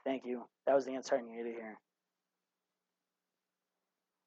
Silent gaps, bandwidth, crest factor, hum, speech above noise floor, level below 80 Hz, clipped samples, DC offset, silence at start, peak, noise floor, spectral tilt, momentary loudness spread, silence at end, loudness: none; 7.4 kHz; 22 dB; none; over 53 dB; under -90 dBFS; under 0.1%; under 0.1%; 0.05 s; -18 dBFS; under -90 dBFS; -3 dB/octave; 12 LU; 2.5 s; -37 LUFS